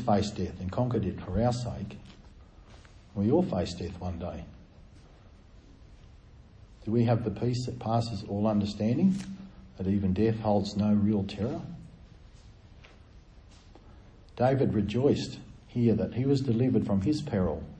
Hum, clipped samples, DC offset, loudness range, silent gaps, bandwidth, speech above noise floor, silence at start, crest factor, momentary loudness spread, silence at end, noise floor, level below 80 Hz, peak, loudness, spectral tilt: none; under 0.1%; under 0.1%; 7 LU; none; 9.2 kHz; 26 dB; 0 s; 18 dB; 15 LU; 0 s; -53 dBFS; -50 dBFS; -12 dBFS; -29 LUFS; -8 dB/octave